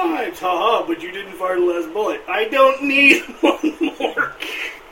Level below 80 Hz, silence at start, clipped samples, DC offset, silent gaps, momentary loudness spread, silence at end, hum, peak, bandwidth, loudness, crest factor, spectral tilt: -56 dBFS; 0 s; under 0.1%; under 0.1%; none; 13 LU; 0 s; none; 0 dBFS; 16.5 kHz; -18 LUFS; 18 dB; -3 dB/octave